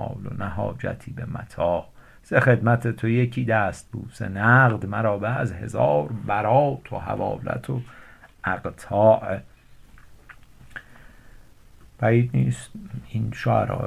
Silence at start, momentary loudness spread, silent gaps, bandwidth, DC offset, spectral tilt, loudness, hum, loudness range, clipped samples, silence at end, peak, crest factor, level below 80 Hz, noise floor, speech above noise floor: 0 s; 15 LU; none; 11.5 kHz; under 0.1%; -8 dB/octave; -23 LUFS; none; 6 LU; under 0.1%; 0 s; -4 dBFS; 20 dB; -48 dBFS; -49 dBFS; 26 dB